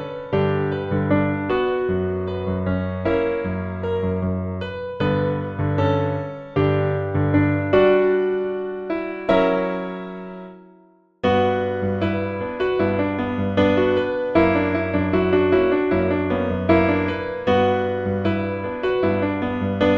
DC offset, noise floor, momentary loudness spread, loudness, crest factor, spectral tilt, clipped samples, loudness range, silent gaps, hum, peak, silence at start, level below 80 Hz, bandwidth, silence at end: under 0.1%; -54 dBFS; 9 LU; -21 LUFS; 16 dB; -9 dB/octave; under 0.1%; 4 LU; none; none; -4 dBFS; 0 s; -46 dBFS; 6.4 kHz; 0 s